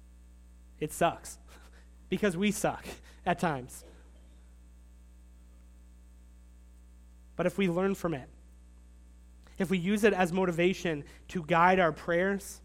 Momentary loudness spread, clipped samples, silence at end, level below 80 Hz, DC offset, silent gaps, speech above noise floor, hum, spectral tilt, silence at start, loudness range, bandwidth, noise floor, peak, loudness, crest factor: 17 LU; under 0.1%; 0.05 s; -54 dBFS; under 0.1%; none; 24 dB; 60 Hz at -55 dBFS; -5.5 dB/octave; 0.8 s; 11 LU; 16 kHz; -54 dBFS; -10 dBFS; -30 LUFS; 22 dB